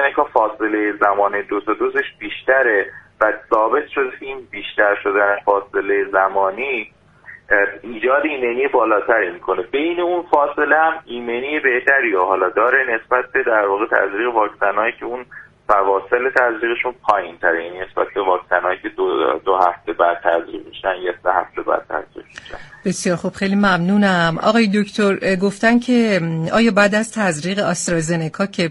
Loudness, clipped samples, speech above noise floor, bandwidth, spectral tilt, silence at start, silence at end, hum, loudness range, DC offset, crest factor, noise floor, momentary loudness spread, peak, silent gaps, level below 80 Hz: -17 LUFS; under 0.1%; 25 dB; 11.5 kHz; -5 dB/octave; 0 s; 0 s; none; 3 LU; under 0.1%; 18 dB; -42 dBFS; 9 LU; 0 dBFS; none; -52 dBFS